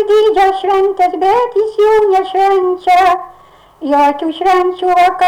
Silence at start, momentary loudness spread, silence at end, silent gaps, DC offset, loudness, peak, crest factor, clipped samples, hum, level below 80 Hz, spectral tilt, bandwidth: 0 s; 4 LU; 0 s; none; under 0.1%; -12 LUFS; -4 dBFS; 6 dB; under 0.1%; none; -46 dBFS; -3.5 dB/octave; 15.5 kHz